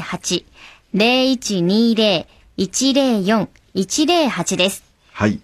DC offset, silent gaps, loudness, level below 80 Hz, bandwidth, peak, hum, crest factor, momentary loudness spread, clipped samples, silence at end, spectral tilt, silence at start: under 0.1%; none; -17 LUFS; -52 dBFS; 14.5 kHz; -2 dBFS; none; 16 dB; 10 LU; under 0.1%; 0.05 s; -4 dB/octave; 0 s